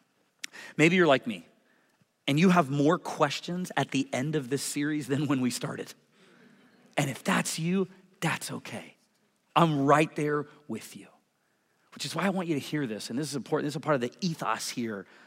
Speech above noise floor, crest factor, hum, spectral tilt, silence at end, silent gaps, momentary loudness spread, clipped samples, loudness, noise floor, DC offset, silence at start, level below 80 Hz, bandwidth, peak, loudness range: 44 dB; 22 dB; none; -5 dB/octave; 0.25 s; none; 16 LU; under 0.1%; -28 LUFS; -72 dBFS; under 0.1%; 0.55 s; -76 dBFS; 16 kHz; -8 dBFS; 6 LU